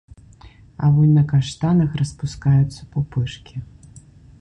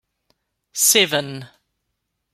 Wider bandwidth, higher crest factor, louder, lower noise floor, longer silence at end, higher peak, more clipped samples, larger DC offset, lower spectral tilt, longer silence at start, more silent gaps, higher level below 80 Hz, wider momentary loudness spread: second, 9 kHz vs 16 kHz; second, 12 dB vs 22 dB; second, -19 LUFS vs -16 LUFS; second, -45 dBFS vs -76 dBFS; second, 0.4 s vs 0.85 s; second, -6 dBFS vs -2 dBFS; neither; neither; first, -7.5 dB/octave vs -1 dB/octave; about the same, 0.8 s vs 0.75 s; neither; first, -42 dBFS vs -70 dBFS; second, 13 LU vs 20 LU